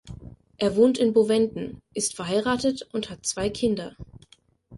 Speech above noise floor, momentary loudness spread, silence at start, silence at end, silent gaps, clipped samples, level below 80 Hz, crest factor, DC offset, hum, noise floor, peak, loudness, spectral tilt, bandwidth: 34 dB; 14 LU; 0.05 s; 0 s; none; under 0.1%; -52 dBFS; 18 dB; under 0.1%; none; -58 dBFS; -8 dBFS; -24 LUFS; -4.5 dB/octave; 11.5 kHz